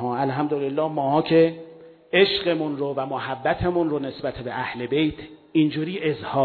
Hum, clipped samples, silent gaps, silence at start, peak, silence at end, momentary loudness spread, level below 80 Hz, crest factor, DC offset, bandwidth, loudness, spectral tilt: none; under 0.1%; none; 0 s; -4 dBFS; 0 s; 10 LU; -50 dBFS; 18 dB; under 0.1%; 4.6 kHz; -23 LUFS; -9 dB/octave